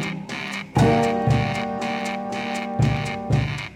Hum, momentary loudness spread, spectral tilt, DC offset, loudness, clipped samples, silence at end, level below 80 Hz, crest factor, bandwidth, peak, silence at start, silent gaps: none; 9 LU; -6.5 dB/octave; under 0.1%; -23 LUFS; under 0.1%; 0 s; -40 dBFS; 16 dB; 12.5 kHz; -6 dBFS; 0 s; none